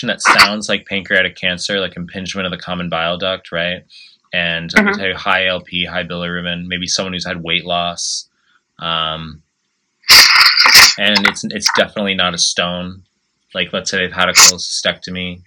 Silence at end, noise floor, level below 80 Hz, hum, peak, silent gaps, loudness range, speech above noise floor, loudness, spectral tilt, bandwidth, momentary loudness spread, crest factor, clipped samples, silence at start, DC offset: 0.05 s; -68 dBFS; -50 dBFS; none; 0 dBFS; none; 11 LU; 51 dB; -12 LUFS; -1.5 dB/octave; over 20 kHz; 16 LU; 16 dB; 0.4%; 0 s; under 0.1%